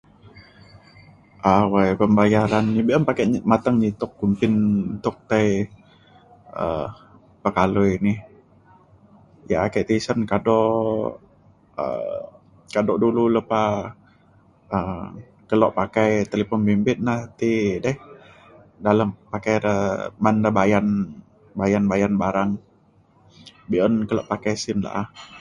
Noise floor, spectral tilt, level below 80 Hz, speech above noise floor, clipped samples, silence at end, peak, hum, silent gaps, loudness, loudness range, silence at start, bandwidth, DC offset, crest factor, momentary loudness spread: -57 dBFS; -7 dB/octave; -48 dBFS; 36 dB; under 0.1%; 0 s; -2 dBFS; none; none; -21 LUFS; 5 LU; 0.25 s; 9.8 kHz; under 0.1%; 20 dB; 11 LU